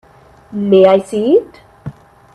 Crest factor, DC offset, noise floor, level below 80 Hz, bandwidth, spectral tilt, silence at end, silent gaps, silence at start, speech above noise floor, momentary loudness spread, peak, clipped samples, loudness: 14 dB; under 0.1%; -32 dBFS; -52 dBFS; 11 kHz; -7.5 dB/octave; 0.45 s; none; 0.5 s; 21 dB; 24 LU; 0 dBFS; under 0.1%; -12 LUFS